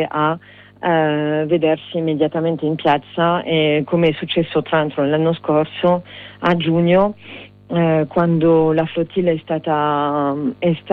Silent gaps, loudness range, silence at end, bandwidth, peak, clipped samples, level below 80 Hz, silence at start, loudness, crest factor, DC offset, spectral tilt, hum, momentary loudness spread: none; 1 LU; 0 s; 4.8 kHz; -4 dBFS; under 0.1%; -54 dBFS; 0 s; -18 LUFS; 14 dB; under 0.1%; -9.5 dB/octave; none; 6 LU